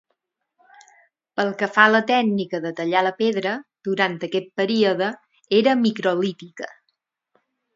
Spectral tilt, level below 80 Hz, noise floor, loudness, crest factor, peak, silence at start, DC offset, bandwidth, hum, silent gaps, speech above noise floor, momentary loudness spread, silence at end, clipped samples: -5.5 dB/octave; -74 dBFS; -75 dBFS; -21 LUFS; 22 dB; 0 dBFS; 1.35 s; under 0.1%; 7.6 kHz; none; none; 55 dB; 14 LU; 1.05 s; under 0.1%